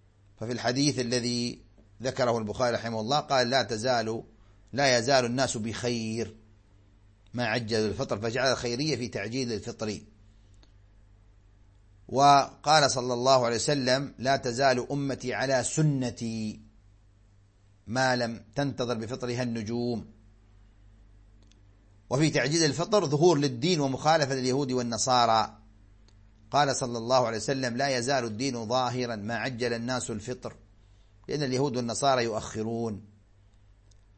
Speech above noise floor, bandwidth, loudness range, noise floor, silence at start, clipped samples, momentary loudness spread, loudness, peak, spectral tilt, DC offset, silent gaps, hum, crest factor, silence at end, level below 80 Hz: 33 dB; 8.8 kHz; 7 LU; -60 dBFS; 0.4 s; under 0.1%; 12 LU; -27 LUFS; -6 dBFS; -4.5 dB/octave; under 0.1%; none; none; 22 dB; 1.1 s; -58 dBFS